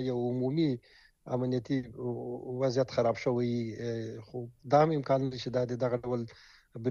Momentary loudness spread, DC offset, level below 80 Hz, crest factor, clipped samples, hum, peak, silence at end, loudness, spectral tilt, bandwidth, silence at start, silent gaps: 12 LU; under 0.1%; -64 dBFS; 20 dB; under 0.1%; none; -12 dBFS; 0 s; -32 LUFS; -7.5 dB/octave; 7.2 kHz; 0 s; none